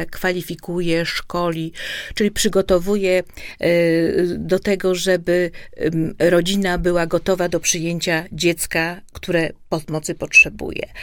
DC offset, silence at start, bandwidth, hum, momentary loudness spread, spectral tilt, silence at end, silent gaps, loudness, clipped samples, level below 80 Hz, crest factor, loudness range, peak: under 0.1%; 0 s; 17.5 kHz; none; 10 LU; -4 dB/octave; 0 s; none; -19 LUFS; under 0.1%; -40 dBFS; 18 dB; 2 LU; 0 dBFS